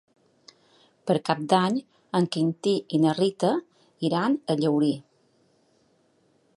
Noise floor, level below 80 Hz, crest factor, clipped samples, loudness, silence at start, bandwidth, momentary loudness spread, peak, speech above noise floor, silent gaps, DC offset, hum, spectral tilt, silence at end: -65 dBFS; -74 dBFS; 20 dB; under 0.1%; -25 LUFS; 1.05 s; 11.5 kHz; 8 LU; -6 dBFS; 41 dB; none; under 0.1%; none; -6.5 dB/octave; 1.55 s